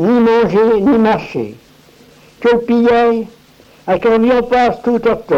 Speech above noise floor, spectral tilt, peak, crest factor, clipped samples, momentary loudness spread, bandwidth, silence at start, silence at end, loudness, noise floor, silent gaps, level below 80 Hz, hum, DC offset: 33 dB; -7 dB/octave; -2 dBFS; 10 dB; under 0.1%; 12 LU; 7.6 kHz; 0 s; 0 s; -13 LUFS; -45 dBFS; none; -42 dBFS; none; under 0.1%